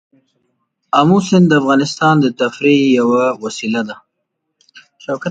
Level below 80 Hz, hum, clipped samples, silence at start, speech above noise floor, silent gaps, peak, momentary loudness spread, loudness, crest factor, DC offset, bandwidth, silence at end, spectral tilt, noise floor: -60 dBFS; none; under 0.1%; 0.95 s; 59 dB; none; 0 dBFS; 12 LU; -14 LUFS; 14 dB; under 0.1%; 9.2 kHz; 0 s; -6 dB/octave; -73 dBFS